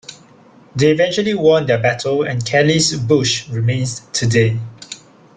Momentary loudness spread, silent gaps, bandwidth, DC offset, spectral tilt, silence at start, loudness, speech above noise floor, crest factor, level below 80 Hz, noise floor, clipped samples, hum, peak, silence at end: 16 LU; none; 9.6 kHz; under 0.1%; -4.5 dB/octave; 0.1 s; -16 LUFS; 30 dB; 14 dB; -50 dBFS; -46 dBFS; under 0.1%; none; -2 dBFS; 0.4 s